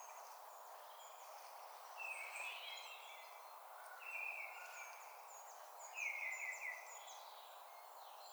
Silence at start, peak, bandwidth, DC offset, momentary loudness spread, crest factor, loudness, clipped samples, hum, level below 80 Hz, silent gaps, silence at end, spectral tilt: 0 s; -34 dBFS; over 20 kHz; under 0.1%; 12 LU; 18 dB; -50 LUFS; under 0.1%; none; under -90 dBFS; none; 0 s; 5 dB/octave